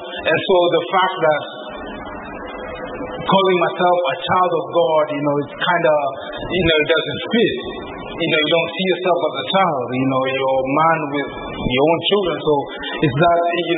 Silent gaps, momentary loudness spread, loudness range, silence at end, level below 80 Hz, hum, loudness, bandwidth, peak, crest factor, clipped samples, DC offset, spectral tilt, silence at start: none; 14 LU; 2 LU; 0 s; -44 dBFS; none; -17 LUFS; 4.1 kHz; -2 dBFS; 16 dB; under 0.1%; under 0.1%; -10.5 dB/octave; 0 s